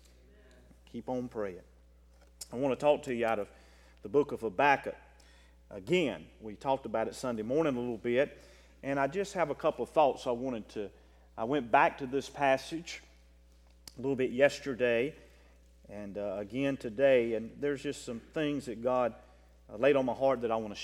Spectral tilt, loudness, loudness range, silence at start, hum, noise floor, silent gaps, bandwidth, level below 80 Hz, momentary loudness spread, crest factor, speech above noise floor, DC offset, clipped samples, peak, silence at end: -5.5 dB/octave; -32 LUFS; 3 LU; 0.95 s; none; -60 dBFS; none; 13.5 kHz; -60 dBFS; 17 LU; 22 dB; 28 dB; under 0.1%; under 0.1%; -10 dBFS; 0 s